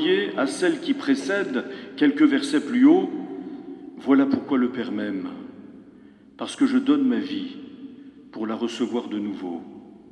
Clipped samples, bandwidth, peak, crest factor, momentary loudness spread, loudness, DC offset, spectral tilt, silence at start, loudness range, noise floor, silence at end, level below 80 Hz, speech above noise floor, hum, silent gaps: under 0.1%; 11 kHz; -6 dBFS; 18 dB; 20 LU; -23 LUFS; under 0.1%; -5 dB/octave; 0 s; 5 LU; -49 dBFS; 0.15 s; -72 dBFS; 27 dB; none; none